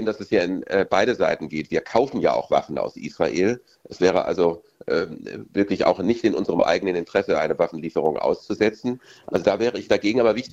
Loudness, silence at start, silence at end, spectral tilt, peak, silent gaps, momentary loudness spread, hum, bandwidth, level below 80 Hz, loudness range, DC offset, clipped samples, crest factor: -22 LUFS; 0 s; 0.05 s; -5.5 dB/octave; -4 dBFS; none; 8 LU; none; 8 kHz; -56 dBFS; 1 LU; under 0.1%; under 0.1%; 18 dB